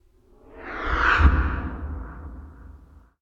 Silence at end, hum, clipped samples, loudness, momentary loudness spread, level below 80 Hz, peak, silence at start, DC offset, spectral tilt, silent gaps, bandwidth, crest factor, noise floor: 0.45 s; none; under 0.1%; -23 LUFS; 24 LU; -28 dBFS; -4 dBFS; 0.5 s; under 0.1%; -7 dB/octave; none; 7.2 kHz; 22 dB; -54 dBFS